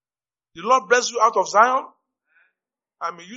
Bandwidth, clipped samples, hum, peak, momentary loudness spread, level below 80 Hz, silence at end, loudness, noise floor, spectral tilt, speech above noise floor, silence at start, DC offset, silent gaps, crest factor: 8 kHz; under 0.1%; none; 0 dBFS; 15 LU; -76 dBFS; 0 s; -18 LUFS; under -90 dBFS; 0 dB/octave; over 71 dB; 0.55 s; under 0.1%; none; 22 dB